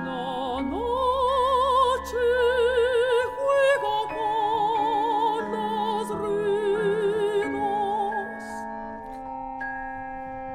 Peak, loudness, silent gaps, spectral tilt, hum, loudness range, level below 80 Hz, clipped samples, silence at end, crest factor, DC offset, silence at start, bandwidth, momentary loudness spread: -10 dBFS; -25 LUFS; none; -4.5 dB/octave; none; 5 LU; -48 dBFS; under 0.1%; 0 s; 16 dB; under 0.1%; 0 s; 15 kHz; 13 LU